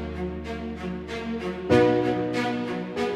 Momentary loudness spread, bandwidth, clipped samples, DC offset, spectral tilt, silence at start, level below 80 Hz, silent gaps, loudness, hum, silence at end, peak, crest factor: 13 LU; 12 kHz; under 0.1%; under 0.1%; -6.5 dB/octave; 0 s; -46 dBFS; none; -26 LUFS; none; 0 s; -6 dBFS; 20 dB